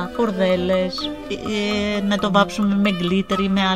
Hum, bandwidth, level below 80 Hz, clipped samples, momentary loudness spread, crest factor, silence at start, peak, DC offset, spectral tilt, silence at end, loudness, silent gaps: none; 12.5 kHz; -46 dBFS; under 0.1%; 7 LU; 18 dB; 0 s; -2 dBFS; 0.5%; -6 dB/octave; 0 s; -20 LUFS; none